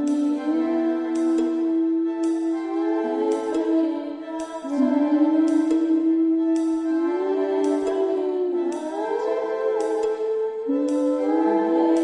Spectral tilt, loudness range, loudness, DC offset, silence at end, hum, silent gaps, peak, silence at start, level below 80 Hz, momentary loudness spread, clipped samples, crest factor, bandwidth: -5 dB/octave; 3 LU; -23 LUFS; under 0.1%; 0 s; none; none; -8 dBFS; 0 s; -68 dBFS; 6 LU; under 0.1%; 12 dB; 10.5 kHz